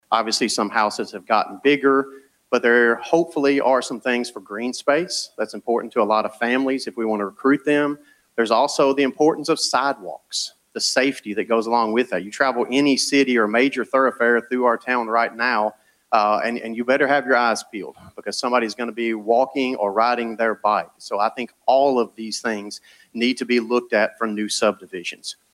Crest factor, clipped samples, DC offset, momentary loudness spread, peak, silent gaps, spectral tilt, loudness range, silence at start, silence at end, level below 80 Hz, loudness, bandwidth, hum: 20 dB; under 0.1%; under 0.1%; 10 LU; -2 dBFS; none; -3 dB/octave; 3 LU; 0.1 s; 0.2 s; -72 dBFS; -20 LUFS; 15 kHz; none